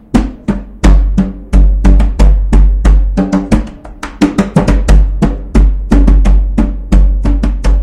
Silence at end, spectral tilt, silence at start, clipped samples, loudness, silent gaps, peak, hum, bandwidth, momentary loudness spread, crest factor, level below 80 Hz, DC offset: 0 s; -7.5 dB/octave; 0.15 s; 1%; -12 LUFS; none; 0 dBFS; none; 9.2 kHz; 6 LU; 8 dB; -8 dBFS; under 0.1%